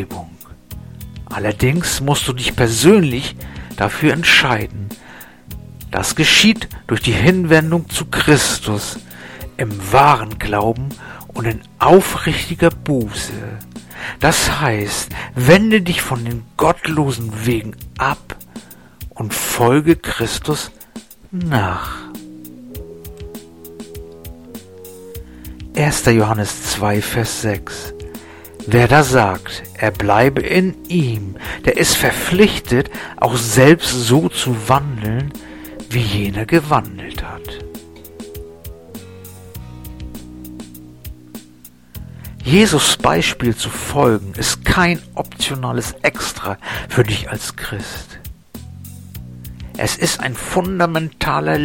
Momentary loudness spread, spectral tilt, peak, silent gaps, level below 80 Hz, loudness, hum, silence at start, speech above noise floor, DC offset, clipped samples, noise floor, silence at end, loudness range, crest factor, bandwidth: 24 LU; -4.5 dB/octave; 0 dBFS; none; -36 dBFS; -16 LUFS; none; 0 s; 28 dB; 0.3%; under 0.1%; -44 dBFS; 0 s; 11 LU; 18 dB; 17 kHz